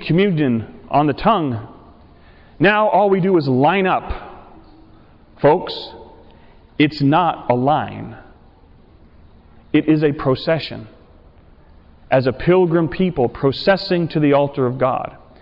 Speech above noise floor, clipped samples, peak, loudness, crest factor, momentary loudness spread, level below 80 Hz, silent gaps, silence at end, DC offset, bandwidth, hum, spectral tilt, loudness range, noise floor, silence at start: 31 dB; under 0.1%; -6 dBFS; -17 LUFS; 12 dB; 15 LU; -44 dBFS; none; 0.25 s; under 0.1%; 5.8 kHz; none; -9.5 dB/octave; 5 LU; -47 dBFS; 0 s